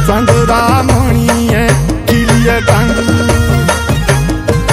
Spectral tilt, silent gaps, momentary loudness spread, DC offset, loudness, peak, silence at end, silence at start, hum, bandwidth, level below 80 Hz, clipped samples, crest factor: -5.5 dB/octave; none; 3 LU; under 0.1%; -10 LUFS; 0 dBFS; 0 s; 0 s; none; 16.5 kHz; -18 dBFS; 0.4%; 10 dB